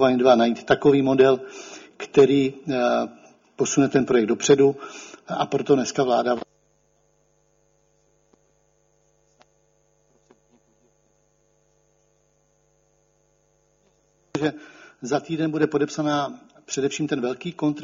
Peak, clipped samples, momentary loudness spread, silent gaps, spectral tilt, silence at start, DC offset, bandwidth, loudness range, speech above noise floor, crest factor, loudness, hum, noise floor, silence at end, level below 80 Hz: -4 dBFS; under 0.1%; 19 LU; none; -5 dB/octave; 0 s; under 0.1%; 7.6 kHz; 13 LU; 45 dB; 20 dB; -21 LUFS; none; -65 dBFS; 0 s; -64 dBFS